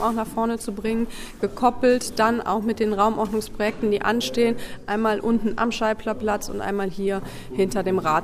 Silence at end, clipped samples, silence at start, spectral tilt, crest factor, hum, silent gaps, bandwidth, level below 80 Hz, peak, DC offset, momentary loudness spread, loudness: 0 s; under 0.1%; 0 s; -5 dB/octave; 16 dB; none; none; 15.5 kHz; -42 dBFS; -6 dBFS; under 0.1%; 7 LU; -23 LUFS